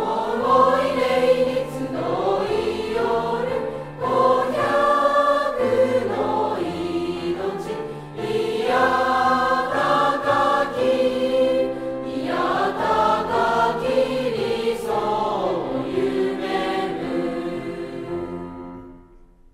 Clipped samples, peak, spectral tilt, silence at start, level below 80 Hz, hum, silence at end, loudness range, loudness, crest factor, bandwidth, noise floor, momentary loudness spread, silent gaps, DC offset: under 0.1%; -4 dBFS; -5.5 dB/octave; 0 s; -50 dBFS; none; 0.35 s; 4 LU; -21 LUFS; 16 dB; 15 kHz; -49 dBFS; 11 LU; none; under 0.1%